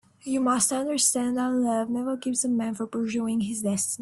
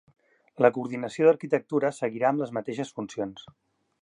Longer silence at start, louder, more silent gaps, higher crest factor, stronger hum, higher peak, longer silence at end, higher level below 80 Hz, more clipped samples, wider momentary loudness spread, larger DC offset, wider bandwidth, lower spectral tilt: second, 0.25 s vs 0.6 s; about the same, -25 LUFS vs -27 LUFS; neither; about the same, 18 dB vs 22 dB; neither; second, -8 dBFS vs -4 dBFS; second, 0.05 s vs 0.6 s; first, -66 dBFS vs -74 dBFS; neither; second, 6 LU vs 11 LU; neither; first, 12.5 kHz vs 10.5 kHz; second, -3.5 dB/octave vs -6.5 dB/octave